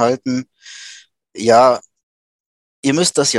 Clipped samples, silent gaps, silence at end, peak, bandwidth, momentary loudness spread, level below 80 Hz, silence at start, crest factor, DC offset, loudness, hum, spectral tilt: under 0.1%; 2.03-2.83 s; 0 s; 0 dBFS; 12.5 kHz; 24 LU; -64 dBFS; 0 s; 16 dB; under 0.1%; -15 LUFS; none; -3.5 dB/octave